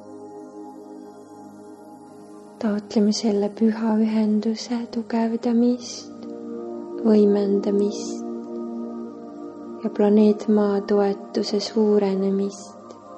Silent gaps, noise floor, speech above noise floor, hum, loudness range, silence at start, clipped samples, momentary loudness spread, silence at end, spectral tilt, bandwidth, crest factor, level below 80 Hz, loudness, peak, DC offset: none; -43 dBFS; 22 dB; none; 4 LU; 0 s; under 0.1%; 23 LU; 0 s; -6.5 dB/octave; 8.6 kHz; 16 dB; -70 dBFS; -22 LUFS; -6 dBFS; under 0.1%